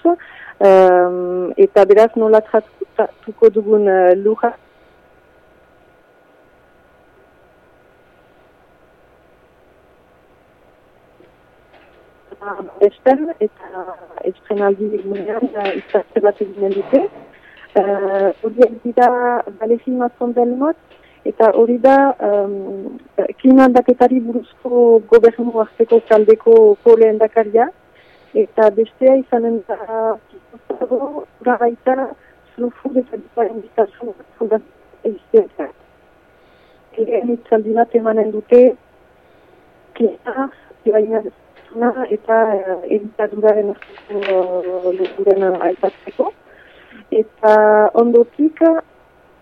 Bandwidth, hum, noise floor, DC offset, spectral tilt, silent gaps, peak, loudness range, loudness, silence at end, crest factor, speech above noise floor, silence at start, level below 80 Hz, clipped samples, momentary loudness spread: 5.8 kHz; none; -51 dBFS; under 0.1%; -7.5 dB/octave; none; 0 dBFS; 9 LU; -15 LUFS; 0.6 s; 16 dB; 36 dB; 0.05 s; -58 dBFS; under 0.1%; 15 LU